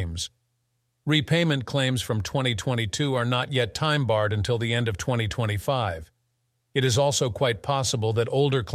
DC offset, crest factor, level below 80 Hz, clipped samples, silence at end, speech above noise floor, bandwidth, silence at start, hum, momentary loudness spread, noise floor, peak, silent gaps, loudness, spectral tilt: under 0.1%; 18 dB; -50 dBFS; under 0.1%; 0 s; 49 dB; 14.5 kHz; 0 s; none; 5 LU; -74 dBFS; -8 dBFS; none; -25 LUFS; -5 dB/octave